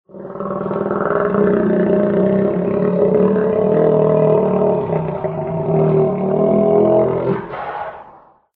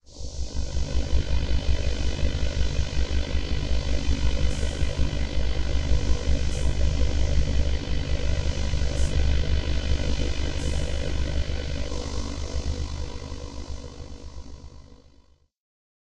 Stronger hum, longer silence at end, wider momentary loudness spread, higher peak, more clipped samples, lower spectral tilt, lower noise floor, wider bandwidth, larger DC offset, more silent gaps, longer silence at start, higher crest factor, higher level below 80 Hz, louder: neither; second, 0.45 s vs 1.1 s; about the same, 10 LU vs 11 LU; first, 0 dBFS vs -8 dBFS; neither; first, -12.5 dB/octave vs -5.5 dB/octave; second, -45 dBFS vs -57 dBFS; second, 4.1 kHz vs 9.4 kHz; neither; neither; about the same, 0.15 s vs 0.1 s; about the same, 16 dB vs 16 dB; second, -48 dBFS vs -26 dBFS; first, -16 LUFS vs -28 LUFS